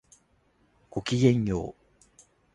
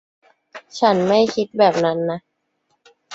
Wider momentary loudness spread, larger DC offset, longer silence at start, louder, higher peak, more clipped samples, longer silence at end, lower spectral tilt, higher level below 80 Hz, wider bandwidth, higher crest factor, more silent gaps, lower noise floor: first, 15 LU vs 12 LU; neither; first, 0.95 s vs 0.55 s; second, -27 LUFS vs -18 LUFS; second, -8 dBFS vs -2 dBFS; neither; first, 0.85 s vs 0 s; about the same, -6.5 dB/octave vs -5.5 dB/octave; first, -52 dBFS vs -62 dBFS; first, 11 kHz vs 8 kHz; about the same, 20 dB vs 18 dB; neither; about the same, -67 dBFS vs -69 dBFS